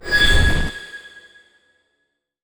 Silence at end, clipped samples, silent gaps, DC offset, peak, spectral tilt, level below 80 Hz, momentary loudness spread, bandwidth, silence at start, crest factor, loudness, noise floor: 1.45 s; under 0.1%; none; under 0.1%; -2 dBFS; -3.5 dB/octave; -26 dBFS; 21 LU; over 20 kHz; 0.05 s; 18 dB; -17 LUFS; -73 dBFS